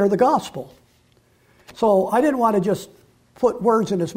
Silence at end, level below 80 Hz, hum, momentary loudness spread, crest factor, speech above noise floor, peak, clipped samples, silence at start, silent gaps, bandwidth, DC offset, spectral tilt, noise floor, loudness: 0 s; -58 dBFS; none; 13 LU; 14 dB; 39 dB; -6 dBFS; under 0.1%; 0 s; none; 16 kHz; under 0.1%; -6.5 dB/octave; -58 dBFS; -19 LUFS